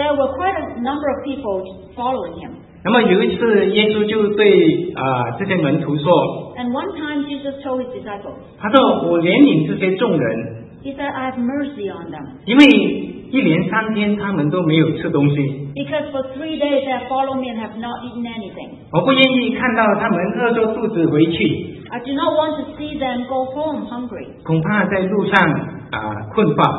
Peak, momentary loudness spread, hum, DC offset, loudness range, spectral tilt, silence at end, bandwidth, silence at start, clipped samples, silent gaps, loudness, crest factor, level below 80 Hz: 0 dBFS; 14 LU; none; under 0.1%; 5 LU; -8 dB/octave; 0 s; 7.6 kHz; 0 s; under 0.1%; none; -17 LUFS; 18 dB; -50 dBFS